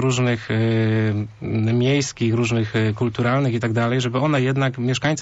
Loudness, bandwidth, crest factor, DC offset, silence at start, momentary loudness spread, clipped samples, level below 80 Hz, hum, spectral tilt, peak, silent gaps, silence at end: -20 LUFS; 8 kHz; 10 dB; under 0.1%; 0 s; 3 LU; under 0.1%; -52 dBFS; none; -6 dB/octave; -10 dBFS; none; 0 s